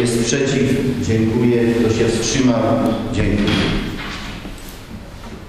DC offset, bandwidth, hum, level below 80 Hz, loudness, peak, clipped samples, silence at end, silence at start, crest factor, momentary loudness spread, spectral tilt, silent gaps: under 0.1%; 15 kHz; none; -32 dBFS; -17 LUFS; 0 dBFS; under 0.1%; 0 s; 0 s; 16 dB; 18 LU; -5 dB/octave; none